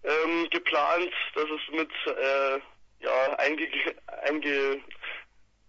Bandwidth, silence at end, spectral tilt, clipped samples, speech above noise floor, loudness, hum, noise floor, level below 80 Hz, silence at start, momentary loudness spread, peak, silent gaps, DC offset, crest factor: 7.6 kHz; 0.45 s; -3 dB/octave; under 0.1%; 25 dB; -28 LUFS; none; -53 dBFS; -68 dBFS; 0 s; 10 LU; -12 dBFS; none; under 0.1%; 16 dB